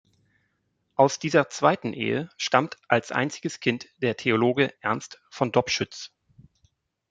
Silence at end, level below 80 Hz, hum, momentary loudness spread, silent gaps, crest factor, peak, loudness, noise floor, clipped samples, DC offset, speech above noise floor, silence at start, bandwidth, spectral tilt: 1.05 s; -68 dBFS; none; 9 LU; none; 24 dB; -2 dBFS; -25 LUFS; -74 dBFS; under 0.1%; under 0.1%; 49 dB; 1 s; 9.4 kHz; -4.5 dB/octave